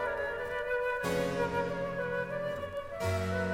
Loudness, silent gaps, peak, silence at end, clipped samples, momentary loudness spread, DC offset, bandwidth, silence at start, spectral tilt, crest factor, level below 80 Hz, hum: -34 LUFS; none; -20 dBFS; 0 s; under 0.1%; 4 LU; under 0.1%; 16.5 kHz; 0 s; -5.5 dB/octave; 14 dB; -56 dBFS; none